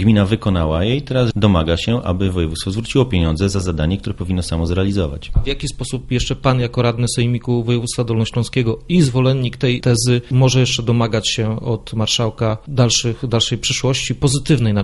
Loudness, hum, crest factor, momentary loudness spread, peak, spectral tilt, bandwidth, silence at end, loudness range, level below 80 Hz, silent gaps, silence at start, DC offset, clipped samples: -17 LUFS; none; 16 dB; 7 LU; -2 dBFS; -5.5 dB/octave; 11.5 kHz; 0 s; 3 LU; -32 dBFS; none; 0 s; under 0.1%; under 0.1%